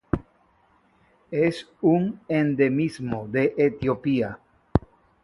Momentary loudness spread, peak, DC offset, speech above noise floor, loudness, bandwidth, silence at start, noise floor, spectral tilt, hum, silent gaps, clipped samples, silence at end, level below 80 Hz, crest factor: 9 LU; 0 dBFS; under 0.1%; 39 dB; -24 LUFS; 11.5 kHz; 0.15 s; -62 dBFS; -8 dB/octave; none; none; under 0.1%; 0.45 s; -44 dBFS; 24 dB